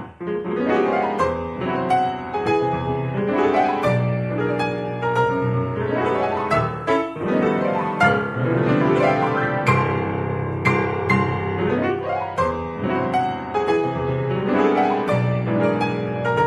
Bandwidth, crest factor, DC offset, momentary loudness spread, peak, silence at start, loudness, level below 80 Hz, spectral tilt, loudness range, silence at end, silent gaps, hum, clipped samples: 11 kHz; 18 dB; under 0.1%; 6 LU; -2 dBFS; 0 s; -21 LUFS; -48 dBFS; -7.5 dB/octave; 2 LU; 0 s; none; none; under 0.1%